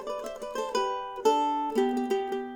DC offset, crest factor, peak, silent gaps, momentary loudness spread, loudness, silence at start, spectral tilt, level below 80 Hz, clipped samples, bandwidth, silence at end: under 0.1%; 16 dB; -12 dBFS; none; 10 LU; -29 LUFS; 0 s; -3.5 dB/octave; -62 dBFS; under 0.1%; 19 kHz; 0 s